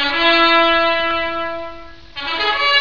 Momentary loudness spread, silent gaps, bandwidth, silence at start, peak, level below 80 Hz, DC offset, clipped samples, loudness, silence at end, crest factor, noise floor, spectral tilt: 17 LU; none; 5.4 kHz; 0 s; -2 dBFS; -44 dBFS; 2%; under 0.1%; -15 LUFS; 0 s; 16 dB; -36 dBFS; -3.5 dB/octave